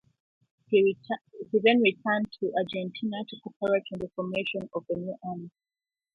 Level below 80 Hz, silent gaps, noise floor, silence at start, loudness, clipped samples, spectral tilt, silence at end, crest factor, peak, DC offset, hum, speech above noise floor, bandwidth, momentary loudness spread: -70 dBFS; 3.56-3.60 s; under -90 dBFS; 0.7 s; -28 LUFS; under 0.1%; -7.5 dB/octave; 0.65 s; 20 dB; -8 dBFS; under 0.1%; none; over 62 dB; 4.8 kHz; 14 LU